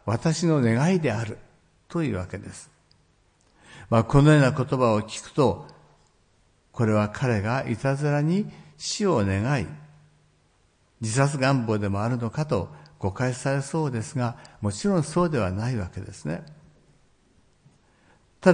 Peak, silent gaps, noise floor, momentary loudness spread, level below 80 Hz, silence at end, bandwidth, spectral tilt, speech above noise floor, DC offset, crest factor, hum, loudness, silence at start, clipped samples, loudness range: -4 dBFS; none; -63 dBFS; 14 LU; -52 dBFS; 0 s; 10.5 kHz; -6.5 dB/octave; 40 dB; under 0.1%; 22 dB; none; -25 LUFS; 0.05 s; under 0.1%; 6 LU